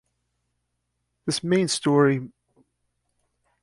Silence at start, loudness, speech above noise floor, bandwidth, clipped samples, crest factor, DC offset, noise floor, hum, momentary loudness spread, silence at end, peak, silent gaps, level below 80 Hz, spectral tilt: 1.25 s; -22 LUFS; 56 dB; 11.5 kHz; under 0.1%; 18 dB; under 0.1%; -77 dBFS; 60 Hz at -65 dBFS; 13 LU; 1.35 s; -8 dBFS; none; -66 dBFS; -5 dB/octave